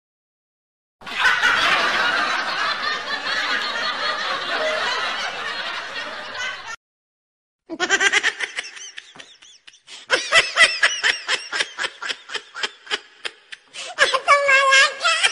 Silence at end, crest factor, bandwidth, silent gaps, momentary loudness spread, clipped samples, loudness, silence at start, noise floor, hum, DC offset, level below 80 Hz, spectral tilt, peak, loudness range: 0 s; 20 dB; 15 kHz; 6.77-7.59 s; 19 LU; under 0.1%; -19 LUFS; 1 s; -48 dBFS; none; under 0.1%; -60 dBFS; 0.5 dB/octave; -2 dBFS; 5 LU